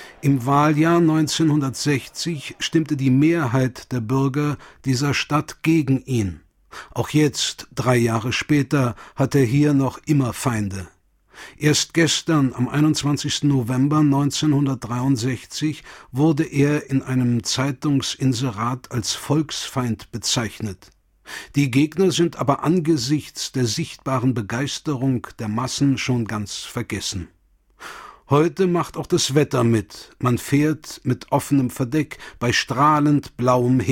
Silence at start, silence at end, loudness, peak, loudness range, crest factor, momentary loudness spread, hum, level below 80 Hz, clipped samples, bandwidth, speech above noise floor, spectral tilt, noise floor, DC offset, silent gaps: 0 s; 0 s; -21 LUFS; -4 dBFS; 4 LU; 16 dB; 9 LU; none; -50 dBFS; under 0.1%; 16.5 kHz; 26 dB; -5.5 dB/octave; -46 dBFS; under 0.1%; none